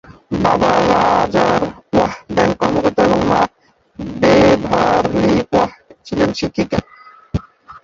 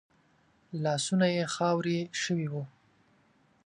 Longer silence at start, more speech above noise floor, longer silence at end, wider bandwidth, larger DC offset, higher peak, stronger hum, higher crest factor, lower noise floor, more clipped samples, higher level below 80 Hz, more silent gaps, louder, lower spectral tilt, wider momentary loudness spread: second, 0.3 s vs 0.7 s; about the same, 40 dB vs 37 dB; second, 0.05 s vs 0.95 s; second, 7.6 kHz vs 11 kHz; neither; first, 0 dBFS vs -14 dBFS; neither; about the same, 16 dB vs 18 dB; second, -54 dBFS vs -67 dBFS; neither; first, -38 dBFS vs -74 dBFS; neither; first, -15 LUFS vs -30 LUFS; about the same, -6 dB/octave vs -5 dB/octave; about the same, 12 LU vs 12 LU